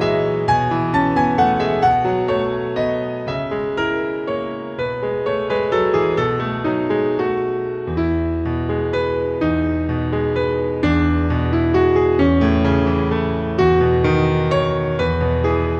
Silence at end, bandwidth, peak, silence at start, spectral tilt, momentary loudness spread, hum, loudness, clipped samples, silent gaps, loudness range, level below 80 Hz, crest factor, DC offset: 0 s; 7.8 kHz; -4 dBFS; 0 s; -8.5 dB/octave; 7 LU; none; -19 LUFS; under 0.1%; none; 4 LU; -36 dBFS; 14 dB; under 0.1%